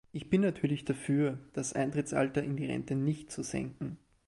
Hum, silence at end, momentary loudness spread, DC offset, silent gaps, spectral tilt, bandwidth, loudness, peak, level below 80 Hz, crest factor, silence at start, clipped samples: none; 0.3 s; 8 LU; under 0.1%; none; -6 dB/octave; 11.5 kHz; -33 LUFS; -16 dBFS; -62 dBFS; 18 dB; 0.15 s; under 0.1%